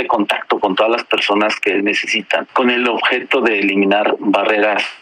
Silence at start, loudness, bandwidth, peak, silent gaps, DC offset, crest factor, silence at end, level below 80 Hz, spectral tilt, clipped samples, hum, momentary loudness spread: 0 s; -15 LUFS; 13.5 kHz; -2 dBFS; none; under 0.1%; 14 dB; 0.05 s; -64 dBFS; -4 dB/octave; under 0.1%; none; 3 LU